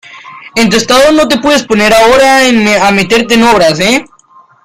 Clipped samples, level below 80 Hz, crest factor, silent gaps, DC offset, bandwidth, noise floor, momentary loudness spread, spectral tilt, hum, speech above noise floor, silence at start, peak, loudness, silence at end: 0.3%; -36 dBFS; 8 dB; none; under 0.1%; 16.5 kHz; -42 dBFS; 5 LU; -3.5 dB/octave; none; 35 dB; 0.1 s; 0 dBFS; -7 LUFS; 0.6 s